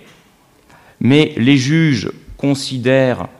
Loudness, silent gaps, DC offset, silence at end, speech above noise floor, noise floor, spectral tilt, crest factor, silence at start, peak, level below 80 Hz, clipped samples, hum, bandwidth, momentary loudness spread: -14 LUFS; none; under 0.1%; 0.15 s; 37 dB; -51 dBFS; -6 dB/octave; 16 dB; 1 s; 0 dBFS; -48 dBFS; under 0.1%; none; 12 kHz; 8 LU